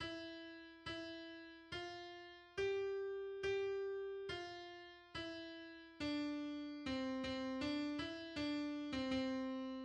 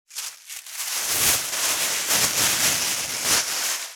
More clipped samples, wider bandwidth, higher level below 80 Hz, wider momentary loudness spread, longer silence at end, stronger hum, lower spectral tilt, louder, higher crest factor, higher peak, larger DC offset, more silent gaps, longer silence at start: neither; second, 9.8 kHz vs over 20 kHz; second, -68 dBFS vs -56 dBFS; about the same, 12 LU vs 14 LU; about the same, 0 s vs 0 s; neither; first, -5 dB/octave vs 0.5 dB/octave; second, -45 LUFS vs -20 LUFS; about the same, 16 dB vs 20 dB; second, -30 dBFS vs -4 dBFS; neither; neither; about the same, 0 s vs 0.1 s